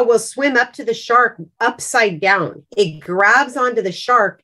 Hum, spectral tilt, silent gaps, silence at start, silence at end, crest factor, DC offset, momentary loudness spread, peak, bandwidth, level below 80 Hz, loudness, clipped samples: none; -3.5 dB/octave; none; 0 s; 0.1 s; 14 dB; under 0.1%; 8 LU; -2 dBFS; 12.5 kHz; -66 dBFS; -16 LUFS; under 0.1%